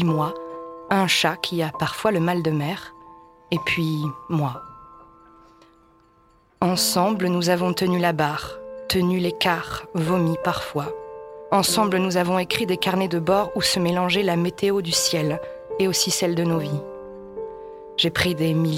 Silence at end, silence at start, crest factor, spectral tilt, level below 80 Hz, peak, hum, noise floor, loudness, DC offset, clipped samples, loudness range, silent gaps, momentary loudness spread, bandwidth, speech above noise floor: 0 s; 0 s; 20 dB; -4.5 dB/octave; -54 dBFS; -4 dBFS; none; -58 dBFS; -22 LUFS; under 0.1%; under 0.1%; 6 LU; none; 15 LU; 16.5 kHz; 36 dB